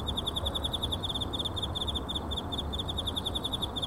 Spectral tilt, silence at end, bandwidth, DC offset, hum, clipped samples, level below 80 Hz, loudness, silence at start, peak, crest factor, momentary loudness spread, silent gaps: -4.5 dB/octave; 0 s; 16 kHz; 0.2%; none; under 0.1%; -40 dBFS; -32 LUFS; 0 s; -18 dBFS; 14 dB; 2 LU; none